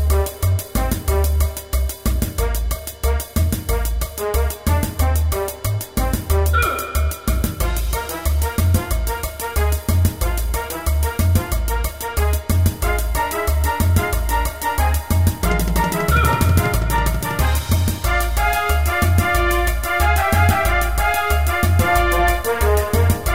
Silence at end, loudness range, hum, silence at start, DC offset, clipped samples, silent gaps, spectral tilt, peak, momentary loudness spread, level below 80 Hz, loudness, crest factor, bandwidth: 0 s; 4 LU; none; 0 s; 0.4%; under 0.1%; none; -5 dB/octave; -2 dBFS; 6 LU; -22 dBFS; -19 LUFS; 16 dB; 16.5 kHz